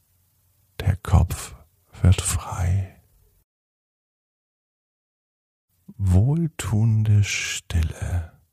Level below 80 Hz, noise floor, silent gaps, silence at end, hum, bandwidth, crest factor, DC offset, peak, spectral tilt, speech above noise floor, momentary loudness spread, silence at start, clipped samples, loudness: -34 dBFS; -64 dBFS; 3.44-5.68 s; 0.25 s; none; 15 kHz; 20 dB; under 0.1%; -4 dBFS; -5 dB/octave; 42 dB; 10 LU; 0.8 s; under 0.1%; -23 LUFS